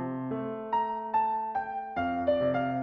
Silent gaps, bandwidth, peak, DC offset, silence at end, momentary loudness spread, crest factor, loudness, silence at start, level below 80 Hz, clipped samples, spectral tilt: none; 5.8 kHz; -16 dBFS; under 0.1%; 0 s; 7 LU; 14 dB; -30 LUFS; 0 s; -60 dBFS; under 0.1%; -9 dB/octave